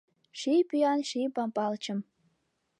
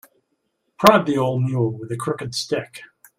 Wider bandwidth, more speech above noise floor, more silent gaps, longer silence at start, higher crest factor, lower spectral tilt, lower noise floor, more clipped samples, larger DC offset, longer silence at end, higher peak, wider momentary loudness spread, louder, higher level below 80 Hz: second, 11 kHz vs 16 kHz; second, 48 dB vs 52 dB; neither; second, 0.35 s vs 0.8 s; second, 16 dB vs 22 dB; about the same, -5 dB/octave vs -5.5 dB/octave; first, -77 dBFS vs -72 dBFS; neither; neither; first, 0.8 s vs 0.35 s; second, -16 dBFS vs 0 dBFS; second, 10 LU vs 13 LU; second, -30 LUFS vs -20 LUFS; second, -88 dBFS vs -58 dBFS